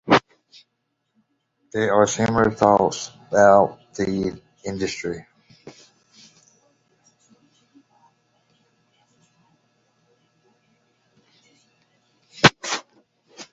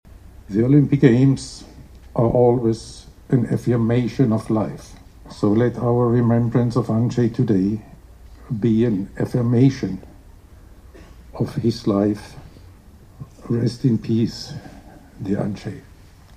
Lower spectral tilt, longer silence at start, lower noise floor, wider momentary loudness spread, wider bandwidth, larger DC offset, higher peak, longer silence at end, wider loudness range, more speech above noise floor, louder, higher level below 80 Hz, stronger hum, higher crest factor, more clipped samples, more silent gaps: second, -4.5 dB/octave vs -8.5 dB/octave; second, 0.05 s vs 0.5 s; first, -75 dBFS vs -45 dBFS; about the same, 16 LU vs 18 LU; second, 8 kHz vs 10.5 kHz; neither; about the same, 0 dBFS vs 0 dBFS; second, 0.1 s vs 0.55 s; first, 15 LU vs 6 LU; first, 56 dB vs 27 dB; about the same, -20 LUFS vs -20 LUFS; second, -54 dBFS vs -44 dBFS; neither; about the same, 24 dB vs 20 dB; neither; neither